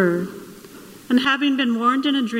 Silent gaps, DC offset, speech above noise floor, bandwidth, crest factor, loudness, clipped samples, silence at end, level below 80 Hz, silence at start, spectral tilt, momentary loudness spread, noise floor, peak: none; under 0.1%; 22 dB; 16 kHz; 14 dB; -19 LUFS; under 0.1%; 0 s; -64 dBFS; 0 s; -5 dB/octave; 21 LU; -42 dBFS; -6 dBFS